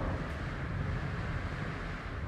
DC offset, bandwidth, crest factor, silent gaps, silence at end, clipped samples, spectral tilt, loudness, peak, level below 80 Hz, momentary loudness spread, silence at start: under 0.1%; 11.5 kHz; 12 dB; none; 0 s; under 0.1%; -7 dB/octave; -38 LUFS; -24 dBFS; -42 dBFS; 3 LU; 0 s